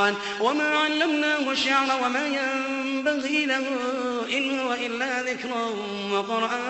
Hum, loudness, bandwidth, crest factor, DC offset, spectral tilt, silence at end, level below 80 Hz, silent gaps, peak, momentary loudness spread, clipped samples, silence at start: none; -24 LUFS; 8.4 kHz; 18 dB; under 0.1%; -3 dB/octave; 0 s; -70 dBFS; none; -8 dBFS; 6 LU; under 0.1%; 0 s